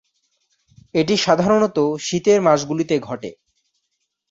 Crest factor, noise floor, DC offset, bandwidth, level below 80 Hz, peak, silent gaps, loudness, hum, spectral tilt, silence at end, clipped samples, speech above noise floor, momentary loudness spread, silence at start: 18 dB; -74 dBFS; under 0.1%; 8 kHz; -58 dBFS; -2 dBFS; none; -18 LUFS; none; -5 dB/octave; 1 s; under 0.1%; 57 dB; 11 LU; 0.95 s